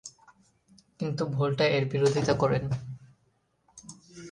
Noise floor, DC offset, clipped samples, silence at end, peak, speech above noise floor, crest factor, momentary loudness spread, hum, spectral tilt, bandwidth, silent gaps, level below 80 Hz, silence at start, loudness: -71 dBFS; under 0.1%; under 0.1%; 0 s; -10 dBFS; 45 dB; 20 dB; 22 LU; none; -6 dB/octave; 11 kHz; none; -58 dBFS; 0.05 s; -27 LUFS